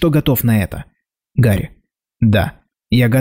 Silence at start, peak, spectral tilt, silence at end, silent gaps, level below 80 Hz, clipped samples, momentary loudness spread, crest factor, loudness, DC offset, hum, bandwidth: 0 s; -4 dBFS; -7 dB/octave; 0 s; none; -38 dBFS; under 0.1%; 11 LU; 12 dB; -16 LUFS; under 0.1%; none; 16.5 kHz